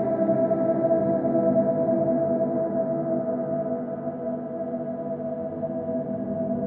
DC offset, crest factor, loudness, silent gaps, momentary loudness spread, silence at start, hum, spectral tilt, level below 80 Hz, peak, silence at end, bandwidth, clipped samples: under 0.1%; 14 dB; -25 LUFS; none; 8 LU; 0 s; none; -11.5 dB/octave; -64 dBFS; -10 dBFS; 0 s; 2.5 kHz; under 0.1%